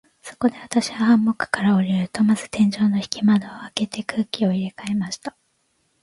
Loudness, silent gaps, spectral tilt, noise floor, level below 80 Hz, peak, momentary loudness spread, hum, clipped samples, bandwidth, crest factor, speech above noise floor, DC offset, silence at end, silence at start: -21 LUFS; none; -5.5 dB/octave; -67 dBFS; -60 dBFS; -2 dBFS; 9 LU; none; under 0.1%; 11.5 kHz; 20 dB; 47 dB; under 0.1%; 0.75 s; 0.25 s